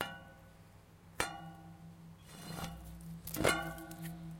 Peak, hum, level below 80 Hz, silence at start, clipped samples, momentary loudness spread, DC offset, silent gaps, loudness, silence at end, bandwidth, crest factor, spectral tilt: -12 dBFS; none; -58 dBFS; 0 s; under 0.1%; 26 LU; under 0.1%; none; -40 LUFS; 0 s; 17 kHz; 30 dB; -3.5 dB/octave